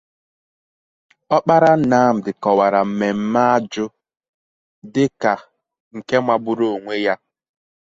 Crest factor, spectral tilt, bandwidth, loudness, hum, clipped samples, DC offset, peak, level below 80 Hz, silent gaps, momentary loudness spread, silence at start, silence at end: 18 dB; -6.5 dB/octave; 7.8 kHz; -18 LUFS; none; under 0.1%; under 0.1%; -2 dBFS; -62 dBFS; 4.29-4.82 s, 5.80-5.91 s; 13 LU; 1.3 s; 0.7 s